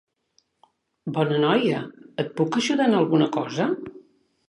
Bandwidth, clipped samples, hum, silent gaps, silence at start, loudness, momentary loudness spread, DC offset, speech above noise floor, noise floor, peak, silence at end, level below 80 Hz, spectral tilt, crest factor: 11 kHz; under 0.1%; none; none; 1.05 s; -23 LUFS; 12 LU; under 0.1%; 46 dB; -68 dBFS; -6 dBFS; 0.5 s; -70 dBFS; -6 dB/octave; 18 dB